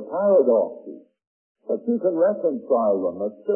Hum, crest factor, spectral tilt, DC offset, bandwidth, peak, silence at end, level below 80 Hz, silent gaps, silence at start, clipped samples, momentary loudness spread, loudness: none; 14 dB; -13 dB/octave; under 0.1%; 1.7 kHz; -8 dBFS; 0 s; -78 dBFS; 1.27-1.55 s; 0 s; under 0.1%; 15 LU; -22 LUFS